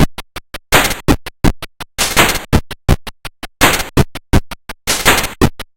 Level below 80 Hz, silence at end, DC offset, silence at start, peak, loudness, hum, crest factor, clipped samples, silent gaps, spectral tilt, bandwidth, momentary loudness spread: -22 dBFS; 0.1 s; under 0.1%; 0 s; 0 dBFS; -14 LUFS; none; 14 dB; under 0.1%; none; -3.5 dB/octave; 17.5 kHz; 19 LU